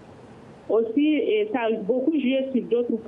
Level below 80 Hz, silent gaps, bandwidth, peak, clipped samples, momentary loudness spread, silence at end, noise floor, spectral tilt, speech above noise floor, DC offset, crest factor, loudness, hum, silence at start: -70 dBFS; none; 3.8 kHz; -10 dBFS; under 0.1%; 3 LU; 0 s; -46 dBFS; -8 dB/octave; 23 dB; under 0.1%; 12 dB; -23 LUFS; none; 0 s